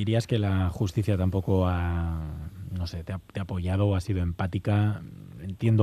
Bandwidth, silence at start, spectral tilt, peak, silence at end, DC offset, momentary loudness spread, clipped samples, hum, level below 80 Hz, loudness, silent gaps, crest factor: 13 kHz; 0 s; -8 dB/octave; -8 dBFS; 0 s; under 0.1%; 12 LU; under 0.1%; none; -46 dBFS; -28 LUFS; none; 18 dB